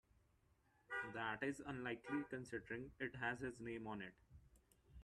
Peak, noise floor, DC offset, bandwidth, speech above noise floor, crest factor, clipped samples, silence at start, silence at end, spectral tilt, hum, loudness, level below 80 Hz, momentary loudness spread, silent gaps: -30 dBFS; -78 dBFS; under 0.1%; 13 kHz; 30 dB; 20 dB; under 0.1%; 0.9 s; 0 s; -5.5 dB/octave; none; -48 LUFS; -72 dBFS; 7 LU; none